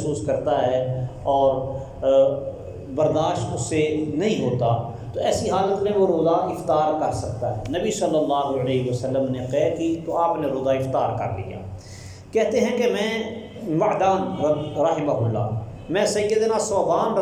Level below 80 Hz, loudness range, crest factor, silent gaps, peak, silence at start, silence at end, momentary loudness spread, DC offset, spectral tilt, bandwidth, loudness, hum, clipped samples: -48 dBFS; 2 LU; 14 dB; none; -8 dBFS; 0 s; 0 s; 8 LU; under 0.1%; -6 dB/octave; 15 kHz; -22 LUFS; none; under 0.1%